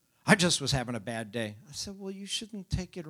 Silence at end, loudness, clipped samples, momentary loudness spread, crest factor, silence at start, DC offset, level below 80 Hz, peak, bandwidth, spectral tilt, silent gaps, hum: 0 s; -30 LUFS; under 0.1%; 15 LU; 24 dB; 0.25 s; under 0.1%; -48 dBFS; -6 dBFS; 16 kHz; -3.5 dB/octave; none; none